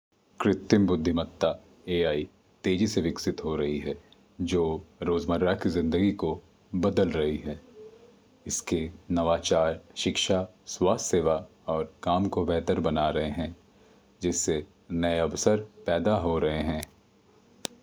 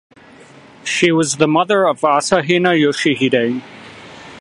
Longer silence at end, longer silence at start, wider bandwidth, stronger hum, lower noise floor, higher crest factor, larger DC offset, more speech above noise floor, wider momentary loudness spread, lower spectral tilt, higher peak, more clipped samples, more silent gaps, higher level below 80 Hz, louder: first, 0.95 s vs 0 s; second, 0.4 s vs 0.85 s; first, over 20 kHz vs 11.5 kHz; neither; first, -60 dBFS vs -42 dBFS; about the same, 20 dB vs 16 dB; neither; first, 33 dB vs 28 dB; second, 10 LU vs 22 LU; about the same, -5 dB/octave vs -4 dB/octave; second, -8 dBFS vs 0 dBFS; neither; neither; first, -52 dBFS vs -58 dBFS; second, -28 LUFS vs -15 LUFS